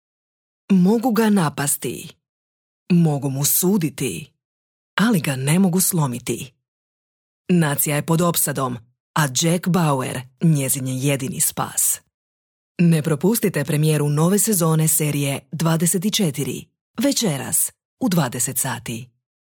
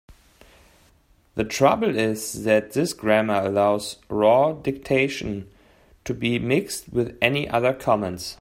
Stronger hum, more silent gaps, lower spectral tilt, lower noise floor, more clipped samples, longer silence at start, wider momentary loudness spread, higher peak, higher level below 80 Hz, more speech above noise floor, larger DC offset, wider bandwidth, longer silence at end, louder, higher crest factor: neither; first, 2.29-2.86 s, 4.45-4.97 s, 6.68-7.45 s, 9.00-9.14 s, 12.14-12.75 s, 16.81-16.94 s, 17.85-17.97 s vs none; about the same, -4.5 dB/octave vs -5 dB/octave; first, under -90 dBFS vs -59 dBFS; neither; first, 0.7 s vs 0.1 s; about the same, 11 LU vs 11 LU; second, -6 dBFS vs -2 dBFS; second, -60 dBFS vs -52 dBFS; first, over 71 dB vs 37 dB; neither; first, 19.5 kHz vs 16 kHz; first, 0.5 s vs 0.05 s; first, -19 LUFS vs -22 LUFS; second, 14 dB vs 20 dB